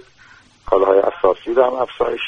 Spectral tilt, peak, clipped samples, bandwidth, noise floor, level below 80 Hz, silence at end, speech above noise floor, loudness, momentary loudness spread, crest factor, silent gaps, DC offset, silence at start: -6 dB/octave; 0 dBFS; under 0.1%; 6.8 kHz; -48 dBFS; -46 dBFS; 0 s; 32 dB; -17 LUFS; 6 LU; 18 dB; none; under 0.1%; 0.65 s